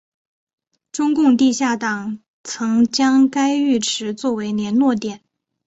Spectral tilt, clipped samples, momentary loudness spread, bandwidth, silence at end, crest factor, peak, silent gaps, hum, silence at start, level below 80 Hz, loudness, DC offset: -4 dB/octave; under 0.1%; 14 LU; 8.2 kHz; 0.5 s; 14 dB; -4 dBFS; 2.28-2.44 s; none; 0.95 s; -62 dBFS; -18 LUFS; under 0.1%